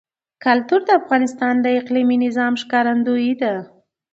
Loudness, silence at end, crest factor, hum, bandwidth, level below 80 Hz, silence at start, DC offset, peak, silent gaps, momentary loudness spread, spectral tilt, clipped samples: -18 LUFS; 0.45 s; 16 dB; none; 7.8 kHz; -72 dBFS; 0.45 s; under 0.1%; -2 dBFS; none; 5 LU; -5 dB/octave; under 0.1%